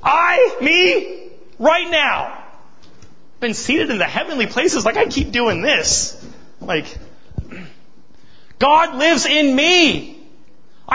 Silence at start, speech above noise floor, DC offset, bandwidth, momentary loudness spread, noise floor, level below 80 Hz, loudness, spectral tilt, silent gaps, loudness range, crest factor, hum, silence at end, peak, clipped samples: 0.05 s; 36 dB; 2%; 8 kHz; 20 LU; -52 dBFS; -42 dBFS; -15 LUFS; -2.5 dB/octave; none; 4 LU; 16 dB; none; 0 s; -2 dBFS; under 0.1%